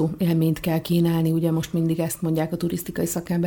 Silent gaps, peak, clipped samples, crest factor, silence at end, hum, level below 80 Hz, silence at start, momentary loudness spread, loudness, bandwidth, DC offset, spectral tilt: none; -10 dBFS; under 0.1%; 12 dB; 0 s; none; -50 dBFS; 0 s; 5 LU; -23 LUFS; over 20 kHz; under 0.1%; -6.5 dB/octave